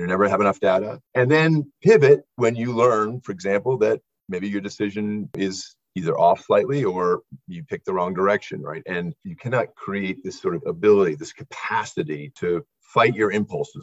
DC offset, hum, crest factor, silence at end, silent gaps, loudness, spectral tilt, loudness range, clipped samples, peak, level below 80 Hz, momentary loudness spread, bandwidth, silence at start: under 0.1%; none; 18 dB; 0 s; none; -22 LUFS; -6.5 dB/octave; 6 LU; under 0.1%; -2 dBFS; -60 dBFS; 13 LU; 8 kHz; 0 s